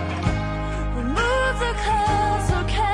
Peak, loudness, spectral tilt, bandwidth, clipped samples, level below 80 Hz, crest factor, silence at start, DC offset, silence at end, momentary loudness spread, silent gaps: -8 dBFS; -23 LUFS; -5.5 dB/octave; 11 kHz; under 0.1%; -28 dBFS; 14 dB; 0 s; under 0.1%; 0 s; 6 LU; none